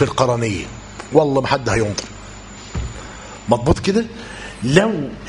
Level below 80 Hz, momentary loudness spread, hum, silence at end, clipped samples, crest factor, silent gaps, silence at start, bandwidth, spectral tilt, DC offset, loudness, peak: -36 dBFS; 18 LU; none; 0 s; under 0.1%; 20 dB; none; 0 s; 11 kHz; -5.5 dB/octave; under 0.1%; -18 LUFS; 0 dBFS